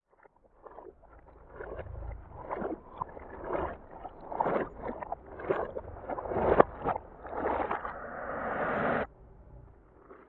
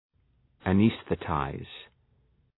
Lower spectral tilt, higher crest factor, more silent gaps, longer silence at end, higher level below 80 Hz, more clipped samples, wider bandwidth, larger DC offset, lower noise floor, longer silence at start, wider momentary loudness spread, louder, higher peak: second, -5.5 dB/octave vs -11 dB/octave; first, 34 dB vs 20 dB; neither; second, 0.05 s vs 0.75 s; about the same, -52 dBFS vs -52 dBFS; neither; about the same, 4.4 kHz vs 4.1 kHz; neither; second, -63 dBFS vs -67 dBFS; about the same, 0.65 s vs 0.65 s; about the same, 20 LU vs 19 LU; second, -34 LUFS vs -28 LUFS; first, -2 dBFS vs -10 dBFS